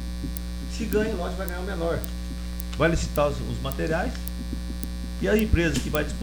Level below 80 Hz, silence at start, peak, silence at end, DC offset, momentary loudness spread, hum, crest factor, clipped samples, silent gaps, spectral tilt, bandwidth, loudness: -32 dBFS; 0 s; -4 dBFS; 0 s; under 0.1%; 10 LU; 60 Hz at -30 dBFS; 22 dB; under 0.1%; none; -5.5 dB/octave; over 20 kHz; -27 LUFS